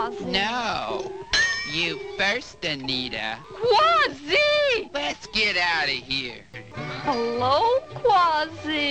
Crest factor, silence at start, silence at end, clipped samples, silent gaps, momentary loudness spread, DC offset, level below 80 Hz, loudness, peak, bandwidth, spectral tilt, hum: 16 dB; 0 s; 0 s; under 0.1%; none; 11 LU; 0.2%; -52 dBFS; -23 LUFS; -8 dBFS; 9.4 kHz; -3 dB/octave; none